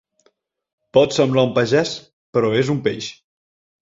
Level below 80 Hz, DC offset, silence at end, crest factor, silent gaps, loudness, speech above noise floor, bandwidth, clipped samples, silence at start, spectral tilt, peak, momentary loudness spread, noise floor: -56 dBFS; under 0.1%; 0.75 s; 18 dB; 2.13-2.33 s; -18 LUFS; 46 dB; 7.8 kHz; under 0.1%; 0.95 s; -5.5 dB/octave; -2 dBFS; 12 LU; -64 dBFS